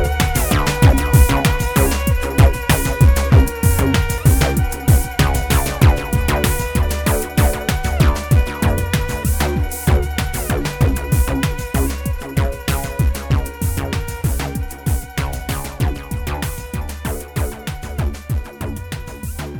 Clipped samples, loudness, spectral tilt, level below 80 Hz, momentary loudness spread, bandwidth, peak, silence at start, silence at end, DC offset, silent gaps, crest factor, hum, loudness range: under 0.1%; -18 LUFS; -5.5 dB/octave; -20 dBFS; 11 LU; over 20 kHz; 0 dBFS; 0 s; 0 s; under 0.1%; none; 16 dB; none; 9 LU